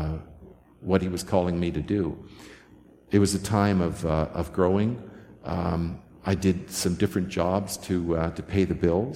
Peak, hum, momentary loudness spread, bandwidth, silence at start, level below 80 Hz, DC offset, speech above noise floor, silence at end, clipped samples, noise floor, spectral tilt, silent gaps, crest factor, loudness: -6 dBFS; none; 12 LU; 16 kHz; 0 s; -44 dBFS; under 0.1%; 28 dB; 0 s; under 0.1%; -53 dBFS; -6 dB/octave; none; 20 dB; -26 LUFS